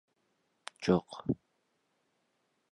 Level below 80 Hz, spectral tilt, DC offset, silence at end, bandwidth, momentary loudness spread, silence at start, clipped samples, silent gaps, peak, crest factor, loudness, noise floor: -64 dBFS; -7 dB/octave; under 0.1%; 1.35 s; 11 kHz; 20 LU; 0.8 s; under 0.1%; none; -14 dBFS; 24 dB; -34 LUFS; -78 dBFS